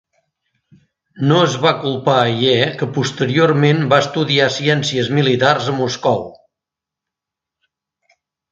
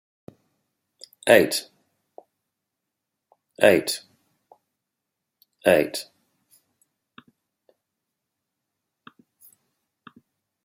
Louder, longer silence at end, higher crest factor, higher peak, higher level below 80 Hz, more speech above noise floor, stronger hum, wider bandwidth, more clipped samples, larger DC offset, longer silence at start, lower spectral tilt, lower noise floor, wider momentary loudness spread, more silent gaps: first, -15 LUFS vs -21 LUFS; second, 2.2 s vs 4.65 s; second, 18 dB vs 26 dB; about the same, 0 dBFS vs -2 dBFS; first, -58 dBFS vs -70 dBFS; first, 70 dB vs 64 dB; neither; second, 7.8 kHz vs 16.5 kHz; neither; neither; about the same, 1.15 s vs 1.25 s; first, -5.5 dB/octave vs -3.5 dB/octave; about the same, -85 dBFS vs -83 dBFS; second, 6 LU vs 15 LU; neither